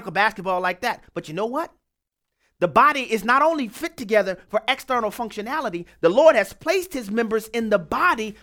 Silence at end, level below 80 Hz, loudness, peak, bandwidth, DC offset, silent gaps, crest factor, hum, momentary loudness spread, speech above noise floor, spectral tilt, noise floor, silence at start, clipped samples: 0.1 s; -56 dBFS; -22 LUFS; -2 dBFS; 18 kHz; under 0.1%; none; 20 dB; none; 12 LU; 59 dB; -4.5 dB/octave; -81 dBFS; 0 s; under 0.1%